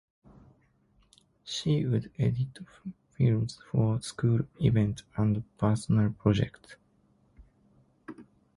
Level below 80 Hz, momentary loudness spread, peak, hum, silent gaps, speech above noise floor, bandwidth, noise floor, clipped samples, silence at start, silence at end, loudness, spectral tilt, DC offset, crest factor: -54 dBFS; 18 LU; -10 dBFS; none; none; 39 dB; 11.5 kHz; -66 dBFS; under 0.1%; 1.45 s; 0.35 s; -29 LUFS; -7 dB/octave; under 0.1%; 20 dB